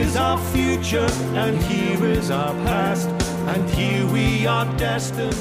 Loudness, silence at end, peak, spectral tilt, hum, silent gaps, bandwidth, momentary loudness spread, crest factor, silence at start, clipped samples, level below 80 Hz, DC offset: -21 LUFS; 0 s; -8 dBFS; -5.5 dB/octave; none; none; 16 kHz; 3 LU; 12 dB; 0 s; under 0.1%; -34 dBFS; under 0.1%